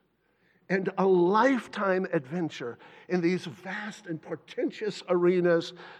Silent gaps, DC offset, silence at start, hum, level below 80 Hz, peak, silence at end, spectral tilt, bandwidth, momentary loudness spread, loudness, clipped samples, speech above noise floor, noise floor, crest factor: none; under 0.1%; 0.7 s; none; -84 dBFS; -10 dBFS; 0 s; -7 dB/octave; 9 kHz; 15 LU; -28 LUFS; under 0.1%; 42 dB; -69 dBFS; 18 dB